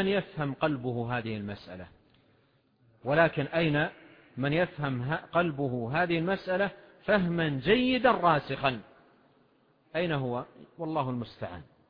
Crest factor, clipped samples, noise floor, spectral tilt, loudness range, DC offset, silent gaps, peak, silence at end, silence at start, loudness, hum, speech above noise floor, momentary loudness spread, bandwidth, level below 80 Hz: 20 dB; under 0.1%; -67 dBFS; -9 dB/octave; 5 LU; under 0.1%; none; -10 dBFS; 0.25 s; 0 s; -29 LUFS; none; 38 dB; 15 LU; 5.2 kHz; -58 dBFS